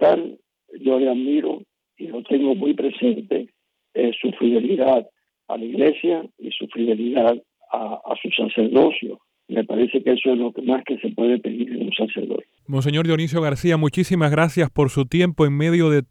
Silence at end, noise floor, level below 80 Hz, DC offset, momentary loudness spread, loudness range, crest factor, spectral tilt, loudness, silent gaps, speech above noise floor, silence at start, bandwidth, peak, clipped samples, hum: 0.05 s; -59 dBFS; -54 dBFS; under 0.1%; 11 LU; 3 LU; 16 dB; -7 dB/octave; -21 LUFS; none; 39 dB; 0 s; 13.5 kHz; -4 dBFS; under 0.1%; none